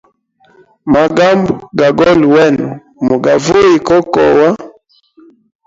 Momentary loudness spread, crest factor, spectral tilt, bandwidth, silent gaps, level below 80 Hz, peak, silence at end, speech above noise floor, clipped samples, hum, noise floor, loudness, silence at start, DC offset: 9 LU; 10 dB; -6 dB/octave; 7.8 kHz; none; -42 dBFS; 0 dBFS; 1 s; 42 dB; under 0.1%; none; -51 dBFS; -10 LUFS; 0.85 s; under 0.1%